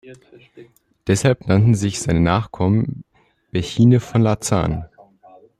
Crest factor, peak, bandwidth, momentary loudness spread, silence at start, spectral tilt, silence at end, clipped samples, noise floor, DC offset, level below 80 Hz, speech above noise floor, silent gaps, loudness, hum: 16 dB; -2 dBFS; 12.5 kHz; 12 LU; 0.05 s; -6.5 dB/octave; 0.75 s; under 0.1%; -51 dBFS; under 0.1%; -42 dBFS; 34 dB; none; -18 LUFS; none